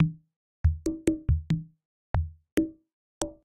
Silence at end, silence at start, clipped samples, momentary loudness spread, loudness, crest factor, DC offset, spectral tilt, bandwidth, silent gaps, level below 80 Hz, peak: 0.1 s; 0 s; under 0.1%; 9 LU; -30 LUFS; 20 dB; under 0.1%; -7 dB/octave; 10.5 kHz; 0.36-0.64 s, 1.85-2.14 s, 2.52-2.57 s, 2.93-3.21 s; -36 dBFS; -10 dBFS